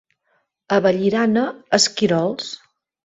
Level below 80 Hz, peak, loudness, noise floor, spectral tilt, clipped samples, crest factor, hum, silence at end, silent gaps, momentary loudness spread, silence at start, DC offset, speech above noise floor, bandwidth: -62 dBFS; -2 dBFS; -18 LUFS; -68 dBFS; -4 dB/octave; under 0.1%; 20 dB; none; 0.5 s; none; 12 LU; 0.7 s; under 0.1%; 49 dB; 8.2 kHz